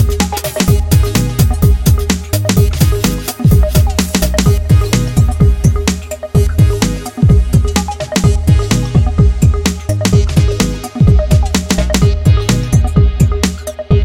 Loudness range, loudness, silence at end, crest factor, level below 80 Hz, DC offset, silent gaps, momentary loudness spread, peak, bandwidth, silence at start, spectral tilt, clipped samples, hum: 1 LU; -12 LUFS; 0 s; 10 dB; -16 dBFS; under 0.1%; none; 5 LU; 0 dBFS; 17 kHz; 0 s; -5.5 dB/octave; under 0.1%; none